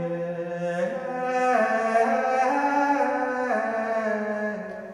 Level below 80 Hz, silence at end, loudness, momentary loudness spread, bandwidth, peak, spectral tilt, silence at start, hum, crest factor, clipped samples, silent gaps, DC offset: -68 dBFS; 0 s; -25 LUFS; 8 LU; 11 kHz; -10 dBFS; -6 dB/octave; 0 s; none; 14 dB; under 0.1%; none; under 0.1%